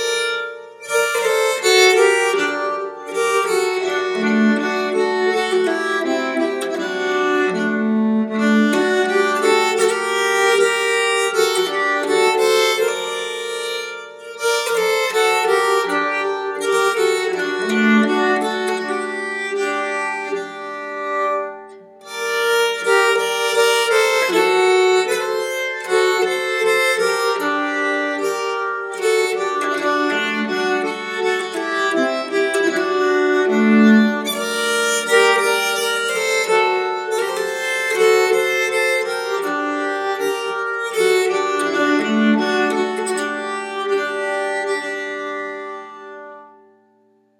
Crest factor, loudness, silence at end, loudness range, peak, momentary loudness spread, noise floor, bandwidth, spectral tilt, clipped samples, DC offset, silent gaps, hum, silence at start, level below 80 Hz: 18 dB; -18 LUFS; 0.9 s; 4 LU; 0 dBFS; 9 LU; -58 dBFS; 18 kHz; -3 dB/octave; under 0.1%; under 0.1%; none; none; 0 s; -82 dBFS